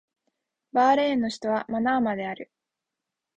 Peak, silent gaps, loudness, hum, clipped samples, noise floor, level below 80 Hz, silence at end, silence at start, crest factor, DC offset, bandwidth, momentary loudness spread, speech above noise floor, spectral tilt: -10 dBFS; none; -25 LUFS; none; under 0.1%; -86 dBFS; -66 dBFS; 0.95 s; 0.75 s; 16 dB; under 0.1%; 9.2 kHz; 11 LU; 62 dB; -5 dB/octave